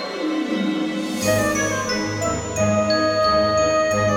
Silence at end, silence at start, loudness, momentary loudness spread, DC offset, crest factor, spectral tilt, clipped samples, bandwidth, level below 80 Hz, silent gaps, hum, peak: 0 s; 0 s; -20 LUFS; 6 LU; under 0.1%; 14 dB; -4 dB/octave; under 0.1%; 18.5 kHz; -44 dBFS; none; none; -6 dBFS